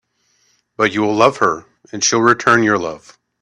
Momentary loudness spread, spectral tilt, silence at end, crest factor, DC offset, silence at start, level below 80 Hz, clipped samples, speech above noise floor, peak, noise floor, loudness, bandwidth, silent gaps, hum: 15 LU; -3.5 dB/octave; 0.45 s; 16 dB; under 0.1%; 0.8 s; -58 dBFS; under 0.1%; 46 dB; 0 dBFS; -61 dBFS; -15 LUFS; 11 kHz; none; none